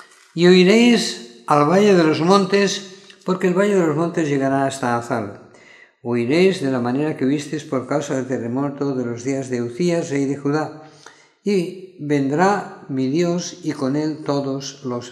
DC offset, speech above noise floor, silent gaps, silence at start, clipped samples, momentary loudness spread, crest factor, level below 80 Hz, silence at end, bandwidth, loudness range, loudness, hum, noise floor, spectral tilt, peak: under 0.1%; 29 dB; none; 0.35 s; under 0.1%; 13 LU; 18 dB; -70 dBFS; 0 s; 12.5 kHz; 7 LU; -19 LUFS; none; -48 dBFS; -5.5 dB/octave; 0 dBFS